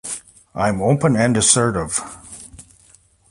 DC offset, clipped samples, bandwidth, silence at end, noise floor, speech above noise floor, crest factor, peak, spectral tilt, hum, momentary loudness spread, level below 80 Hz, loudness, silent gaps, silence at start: under 0.1%; under 0.1%; 11.5 kHz; 0.7 s; -53 dBFS; 35 dB; 20 dB; 0 dBFS; -4 dB/octave; none; 22 LU; -46 dBFS; -17 LUFS; none; 0.05 s